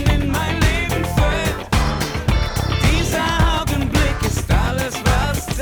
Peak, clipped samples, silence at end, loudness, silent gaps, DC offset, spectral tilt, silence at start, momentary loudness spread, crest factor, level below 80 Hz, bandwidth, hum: -6 dBFS; under 0.1%; 0 s; -19 LUFS; none; under 0.1%; -5 dB/octave; 0 s; 4 LU; 12 dB; -22 dBFS; over 20 kHz; none